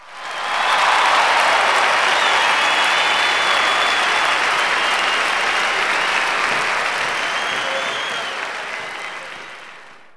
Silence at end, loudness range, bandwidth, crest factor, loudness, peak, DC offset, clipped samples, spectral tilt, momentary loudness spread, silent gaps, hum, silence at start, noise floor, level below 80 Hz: 0.1 s; 6 LU; 11 kHz; 16 dB; -16 LUFS; -2 dBFS; under 0.1%; under 0.1%; 0 dB/octave; 12 LU; none; none; 0 s; -41 dBFS; -58 dBFS